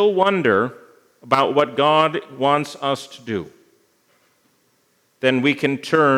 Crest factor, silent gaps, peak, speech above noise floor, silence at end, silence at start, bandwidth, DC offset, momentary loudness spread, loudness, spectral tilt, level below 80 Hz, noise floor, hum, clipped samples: 20 dB; none; 0 dBFS; 45 dB; 0 s; 0 s; 14 kHz; under 0.1%; 12 LU; -19 LUFS; -5.5 dB/octave; -72 dBFS; -63 dBFS; none; under 0.1%